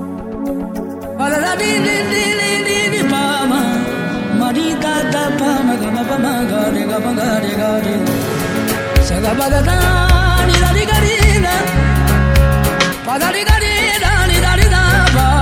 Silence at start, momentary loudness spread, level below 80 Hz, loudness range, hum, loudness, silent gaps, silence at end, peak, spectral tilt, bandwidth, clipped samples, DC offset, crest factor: 0 s; 6 LU; -20 dBFS; 4 LU; none; -14 LUFS; none; 0 s; 0 dBFS; -4.5 dB/octave; 16.5 kHz; under 0.1%; under 0.1%; 14 dB